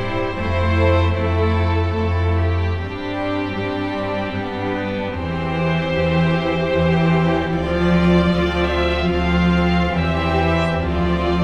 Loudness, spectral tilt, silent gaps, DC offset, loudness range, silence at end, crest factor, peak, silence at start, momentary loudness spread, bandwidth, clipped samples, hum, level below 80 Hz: -19 LUFS; -7.5 dB/octave; none; under 0.1%; 5 LU; 0 s; 14 dB; -4 dBFS; 0 s; 7 LU; 7.8 kHz; under 0.1%; none; -30 dBFS